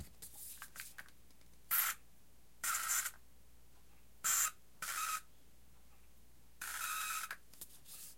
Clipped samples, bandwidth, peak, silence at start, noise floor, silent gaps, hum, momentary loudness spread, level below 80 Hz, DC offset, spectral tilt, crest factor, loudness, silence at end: under 0.1%; 16.5 kHz; -18 dBFS; 0 s; -68 dBFS; none; none; 18 LU; -70 dBFS; 0.1%; 1.5 dB/octave; 26 dB; -39 LUFS; 0.05 s